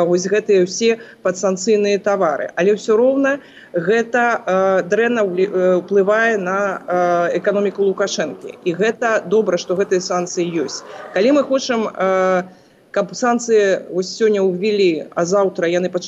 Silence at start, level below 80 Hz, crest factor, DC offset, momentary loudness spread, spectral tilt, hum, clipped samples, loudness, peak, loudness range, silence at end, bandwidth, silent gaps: 0 s; -70 dBFS; 12 dB; under 0.1%; 7 LU; -4.5 dB/octave; none; under 0.1%; -17 LUFS; -6 dBFS; 2 LU; 0 s; 8.2 kHz; none